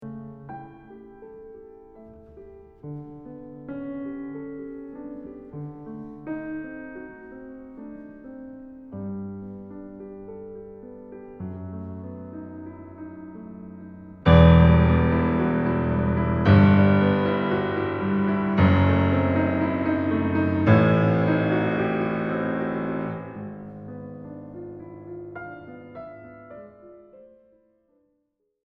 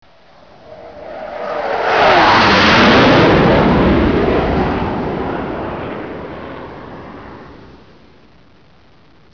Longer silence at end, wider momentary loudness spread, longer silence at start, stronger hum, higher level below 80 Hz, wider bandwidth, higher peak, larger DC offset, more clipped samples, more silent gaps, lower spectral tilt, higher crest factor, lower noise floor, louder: about the same, 1.75 s vs 1.75 s; about the same, 24 LU vs 23 LU; second, 0 s vs 0.7 s; neither; second, -38 dBFS vs -30 dBFS; about the same, 5.2 kHz vs 5.4 kHz; about the same, -2 dBFS vs -2 dBFS; second, under 0.1% vs 0.4%; neither; neither; first, -10 dB/octave vs -6 dB/octave; first, 22 dB vs 14 dB; first, -74 dBFS vs -48 dBFS; second, -21 LUFS vs -12 LUFS